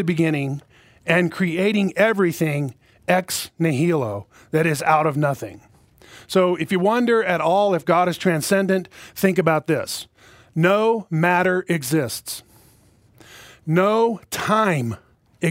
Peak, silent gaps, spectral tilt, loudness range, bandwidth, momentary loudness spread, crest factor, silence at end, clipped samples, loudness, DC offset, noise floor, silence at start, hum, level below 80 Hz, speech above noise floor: -2 dBFS; none; -5.5 dB/octave; 3 LU; 16 kHz; 13 LU; 20 dB; 0 s; under 0.1%; -20 LUFS; under 0.1%; -55 dBFS; 0 s; none; -60 dBFS; 35 dB